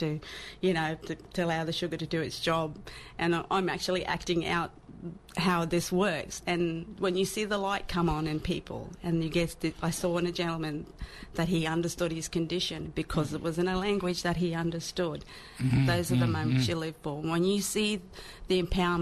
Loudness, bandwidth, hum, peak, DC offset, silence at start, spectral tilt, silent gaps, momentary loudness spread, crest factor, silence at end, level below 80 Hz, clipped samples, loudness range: -30 LUFS; 14 kHz; none; -16 dBFS; under 0.1%; 0 s; -5 dB/octave; none; 10 LU; 14 dB; 0 s; -48 dBFS; under 0.1%; 3 LU